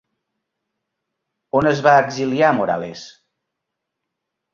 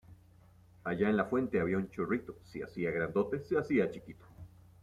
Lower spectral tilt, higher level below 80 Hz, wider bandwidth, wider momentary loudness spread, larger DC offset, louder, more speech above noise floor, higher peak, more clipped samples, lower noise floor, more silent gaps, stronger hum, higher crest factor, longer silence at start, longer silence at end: second, -6 dB/octave vs -8.5 dB/octave; about the same, -58 dBFS vs -62 dBFS; second, 7.4 kHz vs 12 kHz; second, 13 LU vs 17 LU; neither; first, -17 LUFS vs -34 LUFS; first, 63 dB vs 27 dB; first, -2 dBFS vs -16 dBFS; neither; first, -80 dBFS vs -61 dBFS; neither; neither; about the same, 20 dB vs 18 dB; first, 1.55 s vs 0.1 s; first, 1.45 s vs 0.35 s